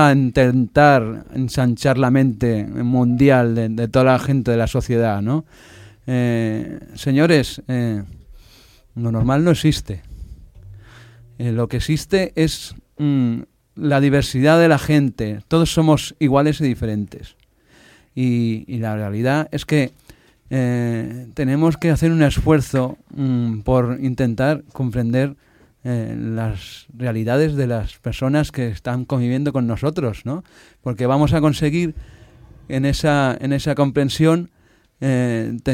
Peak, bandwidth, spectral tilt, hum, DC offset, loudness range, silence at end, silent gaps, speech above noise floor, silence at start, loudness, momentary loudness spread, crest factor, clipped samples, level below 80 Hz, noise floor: -2 dBFS; 16 kHz; -7 dB/octave; none; under 0.1%; 6 LU; 0 s; none; 34 dB; 0 s; -19 LUFS; 11 LU; 16 dB; under 0.1%; -38 dBFS; -52 dBFS